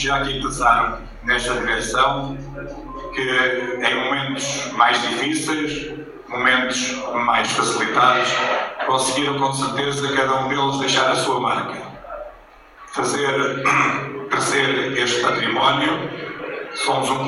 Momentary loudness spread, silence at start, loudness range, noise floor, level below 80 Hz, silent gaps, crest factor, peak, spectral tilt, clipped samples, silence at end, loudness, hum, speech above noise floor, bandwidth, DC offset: 13 LU; 0 s; 3 LU; -45 dBFS; -44 dBFS; none; 20 dB; 0 dBFS; -3 dB/octave; under 0.1%; 0 s; -19 LUFS; none; 25 dB; 12.5 kHz; under 0.1%